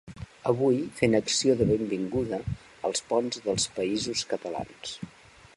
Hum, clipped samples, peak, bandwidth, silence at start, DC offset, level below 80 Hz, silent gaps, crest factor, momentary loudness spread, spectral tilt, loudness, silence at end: none; under 0.1%; -8 dBFS; 11.5 kHz; 0.05 s; under 0.1%; -52 dBFS; none; 22 dB; 14 LU; -4.5 dB/octave; -28 LUFS; 0.45 s